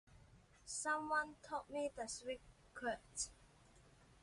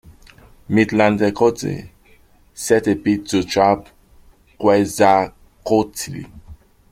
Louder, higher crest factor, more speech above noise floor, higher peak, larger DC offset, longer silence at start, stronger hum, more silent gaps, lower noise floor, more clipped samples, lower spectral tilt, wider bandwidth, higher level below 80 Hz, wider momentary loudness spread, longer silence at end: second, -44 LUFS vs -18 LUFS; about the same, 20 dB vs 18 dB; second, 23 dB vs 34 dB; second, -28 dBFS vs -2 dBFS; neither; about the same, 0.1 s vs 0.1 s; neither; neither; first, -67 dBFS vs -51 dBFS; neither; second, -2 dB/octave vs -5.5 dB/octave; second, 11.5 kHz vs 16 kHz; second, -70 dBFS vs -48 dBFS; second, 10 LU vs 14 LU; second, 0.1 s vs 0.35 s